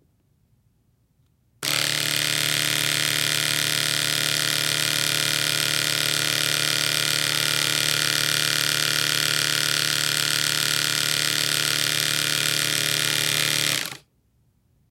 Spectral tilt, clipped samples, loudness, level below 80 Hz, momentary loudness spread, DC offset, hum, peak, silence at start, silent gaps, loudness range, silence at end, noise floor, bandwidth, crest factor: -0.5 dB/octave; under 0.1%; -20 LUFS; -64 dBFS; 1 LU; under 0.1%; none; -2 dBFS; 1.6 s; none; 2 LU; 0.95 s; -65 dBFS; 17 kHz; 22 dB